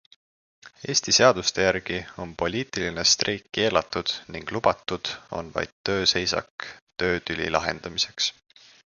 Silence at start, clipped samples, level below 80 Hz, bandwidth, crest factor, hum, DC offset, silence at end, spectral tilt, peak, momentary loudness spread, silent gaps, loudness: 0.65 s; under 0.1%; -52 dBFS; 10.5 kHz; 24 dB; none; under 0.1%; 0.65 s; -2.5 dB/octave; -2 dBFS; 12 LU; 5.72-5.84 s, 6.51-6.58 s, 6.82-6.87 s; -24 LUFS